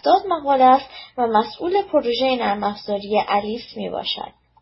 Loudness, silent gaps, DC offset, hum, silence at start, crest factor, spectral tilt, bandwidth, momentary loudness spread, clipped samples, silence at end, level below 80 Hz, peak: -20 LUFS; none; under 0.1%; none; 0.05 s; 16 dB; -8 dB/octave; 5.8 kHz; 13 LU; under 0.1%; 0.35 s; -56 dBFS; -2 dBFS